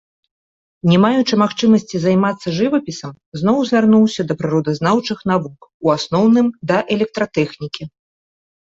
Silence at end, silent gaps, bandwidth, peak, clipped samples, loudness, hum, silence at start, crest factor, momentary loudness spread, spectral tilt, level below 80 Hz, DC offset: 0.8 s; 3.26-3.32 s, 5.74-5.80 s; 7.8 kHz; -2 dBFS; under 0.1%; -16 LUFS; none; 0.85 s; 14 dB; 13 LU; -6.5 dB/octave; -56 dBFS; under 0.1%